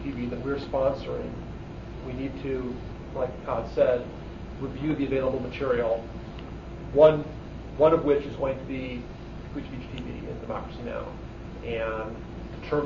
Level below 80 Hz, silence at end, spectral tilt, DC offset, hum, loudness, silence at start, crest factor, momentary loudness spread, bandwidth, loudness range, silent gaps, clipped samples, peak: -42 dBFS; 0 s; -8 dB/octave; under 0.1%; none; -28 LUFS; 0 s; 22 dB; 17 LU; 7.2 kHz; 10 LU; none; under 0.1%; -6 dBFS